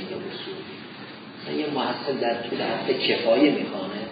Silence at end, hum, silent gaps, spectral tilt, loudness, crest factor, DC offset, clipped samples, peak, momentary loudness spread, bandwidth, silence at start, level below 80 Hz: 0 s; none; none; -9.5 dB/octave; -25 LUFS; 20 dB; under 0.1%; under 0.1%; -6 dBFS; 18 LU; 5 kHz; 0 s; -72 dBFS